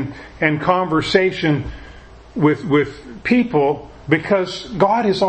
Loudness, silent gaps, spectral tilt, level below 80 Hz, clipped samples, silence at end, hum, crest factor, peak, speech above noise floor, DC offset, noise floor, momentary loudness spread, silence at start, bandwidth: -18 LUFS; none; -6.5 dB/octave; -42 dBFS; under 0.1%; 0 s; none; 18 dB; 0 dBFS; 23 dB; under 0.1%; -40 dBFS; 12 LU; 0 s; 8.6 kHz